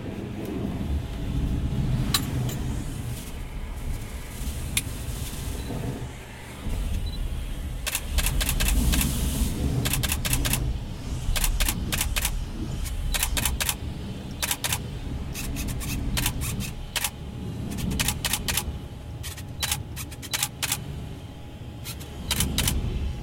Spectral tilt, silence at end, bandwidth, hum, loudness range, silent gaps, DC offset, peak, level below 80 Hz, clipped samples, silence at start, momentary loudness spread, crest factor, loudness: -3.5 dB/octave; 0 s; 17 kHz; none; 6 LU; none; under 0.1%; -4 dBFS; -32 dBFS; under 0.1%; 0 s; 12 LU; 24 dB; -28 LUFS